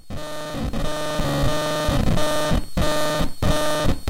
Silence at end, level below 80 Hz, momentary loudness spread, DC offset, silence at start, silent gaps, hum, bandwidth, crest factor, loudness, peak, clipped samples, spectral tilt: 0 s; -28 dBFS; 7 LU; under 0.1%; 0.05 s; none; none; 16.5 kHz; 12 dB; -23 LUFS; -8 dBFS; under 0.1%; -5 dB/octave